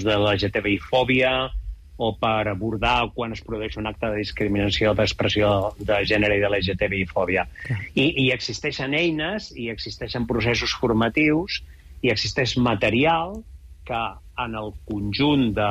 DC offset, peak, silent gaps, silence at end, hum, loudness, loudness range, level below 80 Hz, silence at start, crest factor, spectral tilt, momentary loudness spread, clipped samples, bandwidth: under 0.1%; -10 dBFS; none; 0 s; none; -23 LUFS; 2 LU; -40 dBFS; 0 s; 14 dB; -5.5 dB/octave; 11 LU; under 0.1%; 13.5 kHz